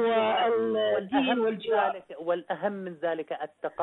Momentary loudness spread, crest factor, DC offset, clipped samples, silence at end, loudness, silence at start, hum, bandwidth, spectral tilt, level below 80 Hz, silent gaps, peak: 10 LU; 14 dB; under 0.1%; under 0.1%; 0 s; -28 LUFS; 0 s; none; 4.1 kHz; -7.5 dB/octave; -74 dBFS; none; -14 dBFS